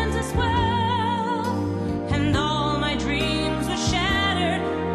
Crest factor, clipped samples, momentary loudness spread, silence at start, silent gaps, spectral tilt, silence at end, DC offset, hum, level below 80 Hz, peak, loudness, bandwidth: 12 dB; under 0.1%; 4 LU; 0 s; none; -5 dB/octave; 0 s; under 0.1%; none; -36 dBFS; -10 dBFS; -23 LUFS; 13 kHz